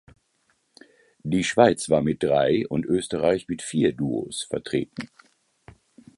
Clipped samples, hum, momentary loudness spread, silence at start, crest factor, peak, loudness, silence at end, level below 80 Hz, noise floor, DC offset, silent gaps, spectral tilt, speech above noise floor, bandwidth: under 0.1%; none; 11 LU; 1.25 s; 22 dB; -2 dBFS; -23 LUFS; 1.15 s; -54 dBFS; -69 dBFS; under 0.1%; none; -5.5 dB/octave; 46 dB; 11.5 kHz